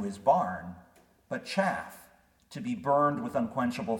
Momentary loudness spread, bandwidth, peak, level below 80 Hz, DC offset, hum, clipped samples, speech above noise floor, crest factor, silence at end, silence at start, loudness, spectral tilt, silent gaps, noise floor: 15 LU; 18 kHz; -12 dBFS; -66 dBFS; under 0.1%; none; under 0.1%; 31 dB; 20 dB; 0 s; 0 s; -30 LUFS; -6 dB/octave; none; -61 dBFS